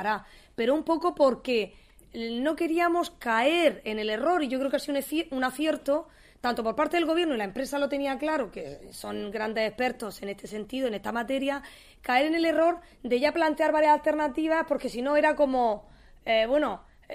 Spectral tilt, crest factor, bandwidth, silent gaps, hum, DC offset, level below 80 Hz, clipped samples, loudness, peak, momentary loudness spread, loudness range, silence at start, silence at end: -4 dB/octave; 18 dB; 15.5 kHz; none; none; under 0.1%; -56 dBFS; under 0.1%; -27 LUFS; -10 dBFS; 13 LU; 6 LU; 0 s; 0 s